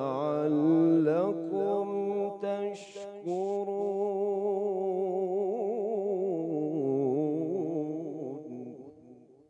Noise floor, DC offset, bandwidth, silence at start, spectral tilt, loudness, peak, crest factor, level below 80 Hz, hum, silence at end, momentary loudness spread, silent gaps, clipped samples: -55 dBFS; under 0.1%; 8.2 kHz; 0 s; -8.5 dB/octave; -30 LUFS; -16 dBFS; 14 dB; -90 dBFS; none; 0.3 s; 14 LU; none; under 0.1%